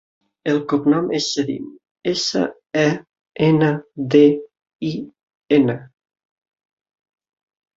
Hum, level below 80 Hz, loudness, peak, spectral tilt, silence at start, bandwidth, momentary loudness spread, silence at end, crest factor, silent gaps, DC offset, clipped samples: none; -60 dBFS; -19 LUFS; -2 dBFS; -5.5 dB/octave; 0.45 s; 8 kHz; 15 LU; 1.9 s; 18 dB; 1.91-1.95 s, 3.21-3.25 s, 4.75-4.79 s, 5.23-5.27 s, 5.35-5.41 s; under 0.1%; under 0.1%